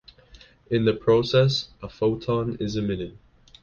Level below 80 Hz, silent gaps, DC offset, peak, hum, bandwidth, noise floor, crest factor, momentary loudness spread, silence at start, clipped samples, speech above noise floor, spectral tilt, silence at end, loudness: -50 dBFS; none; under 0.1%; -6 dBFS; none; 7.2 kHz; -52 dBFS; 18 dB; 11 LU; 0.35 s; under 0.1%; 28 dB; -6.5 dB/octave; 0.5 s; -24 LUFS